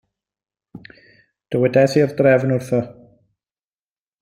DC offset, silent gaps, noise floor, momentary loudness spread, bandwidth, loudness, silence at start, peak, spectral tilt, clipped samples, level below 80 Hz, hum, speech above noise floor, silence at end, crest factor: under 0.1%; none; under -90 dBFS; 9 LU; 15 kHz; -17 LUFS; 1.5 s; -2 dBFS; -7 dB/octave; under 0.1%; -60 dBFS; none; over 74 dB; 1.3 s; 18 dB